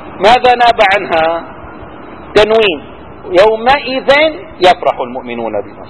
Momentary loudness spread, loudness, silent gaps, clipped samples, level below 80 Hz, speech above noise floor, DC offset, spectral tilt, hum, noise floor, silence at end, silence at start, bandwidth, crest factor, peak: 22 LU; -10 LUFS; none; 1%; -40 dBFS; 20 dB; 0.7%; -4.5 dB/octave; none; -30 dBFS; 0 s; 0 s; 11 kHz; 12 dB; 0 dBFS